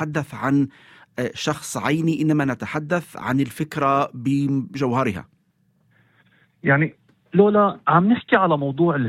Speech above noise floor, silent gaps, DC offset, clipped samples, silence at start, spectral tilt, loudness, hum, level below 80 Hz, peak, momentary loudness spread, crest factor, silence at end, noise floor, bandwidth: 44 dB; none; under 0.1%; under 0.1%; 0 s; -6.5 dB/octave; -21 LUFS; none; -60 dBFS; -2 dBFS; 9 LU; 20 dB; 0 s; -64 dBFS; 15.5 kHz